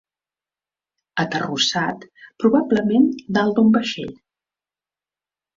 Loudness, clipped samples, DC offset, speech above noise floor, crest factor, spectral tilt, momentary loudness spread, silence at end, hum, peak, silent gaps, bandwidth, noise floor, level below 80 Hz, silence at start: -19 LUFS; under 0.1%; under 0.1%; over 71 dB; 18 dB; -5 dB/octave; 13 LU; 1.45 s; 50 Hz at -50 dBFS; -4 dBFS; none; 7.6 kHz; under -90 dBFS; -62 dBFS; 1.15 s